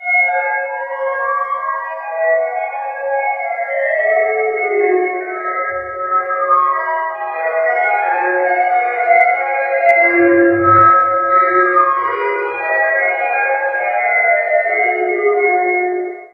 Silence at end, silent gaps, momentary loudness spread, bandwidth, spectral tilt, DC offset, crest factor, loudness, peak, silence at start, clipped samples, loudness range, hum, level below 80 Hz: 0.05 s; none; 9 LU; 5 kHz; -8 dB/octave; under 0.1%; 14 dB; -14 LUFS; 0 dBFS; 0 s; under 0.1%; 6 LU; none; -58 dBFS